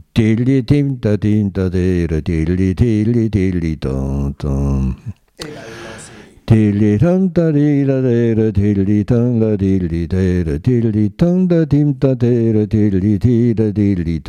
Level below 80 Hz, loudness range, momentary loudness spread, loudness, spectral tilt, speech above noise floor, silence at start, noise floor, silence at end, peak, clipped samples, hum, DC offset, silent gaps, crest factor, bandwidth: -30 dBFS; 4 LU; 7 LU; -15 LUFS; -9 dB/octave; 24 dB; 0.15 s; -38 dBFS; 0 s; -2 dBFS; under 0.1%; none; under 0.1%; none; 12 dB; 10 kHz